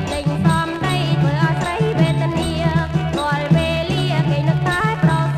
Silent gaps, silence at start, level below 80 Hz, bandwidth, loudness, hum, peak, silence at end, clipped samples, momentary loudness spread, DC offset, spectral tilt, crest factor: none; 0 s; -36 dBFS; 13 kHz; -18 LUFS; none; -2 dBFS; 0 s; under 0.1%; 3 LU; under 0.1%; -6.5 dB/octave; 16 dB